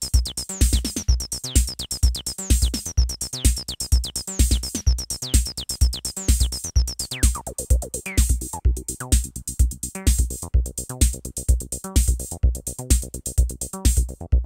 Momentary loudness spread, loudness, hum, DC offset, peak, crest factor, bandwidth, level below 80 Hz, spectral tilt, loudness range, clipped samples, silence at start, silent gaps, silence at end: 5 LU; -23 LUFS; none; under 0.1%; -4 dBFS; 18 dB; 16.5 kHz; -22 dBFS; -3.5 dB/octave; 1 LU; under 0.1%; 0 s; none; 0 s